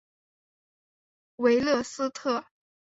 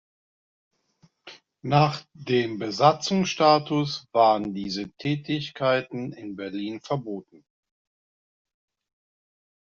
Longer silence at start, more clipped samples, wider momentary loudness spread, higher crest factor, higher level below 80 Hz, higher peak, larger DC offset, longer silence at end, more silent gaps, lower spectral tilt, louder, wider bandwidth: first, 1.4 s vs 1.25 s; neither; second, 8 LU vs 14 LU; about the same, 20 dB vs 22 dB; about the same, -66 dBFS vs -64 dBFS; second, -10 dBFS vs -4 dBFS; neither; second, 0.55 s vs 2.4 s; neither; about the same, -4 dB/octave vs -4.5 dB/octave; second, -27 LUFS vs -24 LUFS; about the same, 8 kHz vs 7.6 kHz